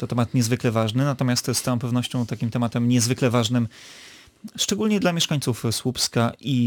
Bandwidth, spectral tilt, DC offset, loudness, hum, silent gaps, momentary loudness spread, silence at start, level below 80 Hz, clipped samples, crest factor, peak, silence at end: 19 kHz; -5 dB/octave; under 0.1%; -23 LUFS; none; none; 6 LU; 0 s; -58 dBFS; under 0.1%; 16 dB; -8 dBFS; 0 s